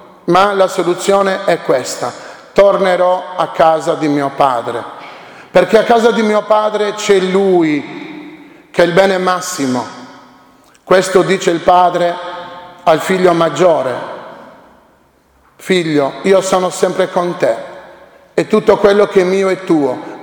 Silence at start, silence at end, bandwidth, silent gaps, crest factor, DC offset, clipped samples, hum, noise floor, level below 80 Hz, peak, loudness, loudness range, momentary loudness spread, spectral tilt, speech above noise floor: 0.25 s; 0 s; over 20 kHz; none; 14 dB; under 0.1%; 0.2%; none; -51 dBFS; -50 dBFS; 0 dBFS; -13 LUFS; 3 LU; 15 LU; -5 dB/octave; 39 dB